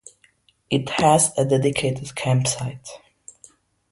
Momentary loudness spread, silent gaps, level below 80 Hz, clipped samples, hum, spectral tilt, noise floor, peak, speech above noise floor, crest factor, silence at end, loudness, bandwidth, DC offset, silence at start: 19 LU; none; -54 dBFS; under 0.1%; none; -4.5 dB/octave; -60 dBFS; -2 dBFS; 40 dB; 20 dB; 0.95 s; -21 LUFS; 12 kHz; under 0.1%; 0.7 s